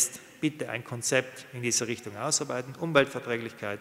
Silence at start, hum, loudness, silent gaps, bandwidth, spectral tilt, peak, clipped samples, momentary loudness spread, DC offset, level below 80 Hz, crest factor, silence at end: 0 s; none; -29 LUFS; none; 16 kHz; -3 dB/octave; -4 dBFS; under 0.1%; 9 LU; under 0.1%; -72 dBFS; 26 dB; 0 s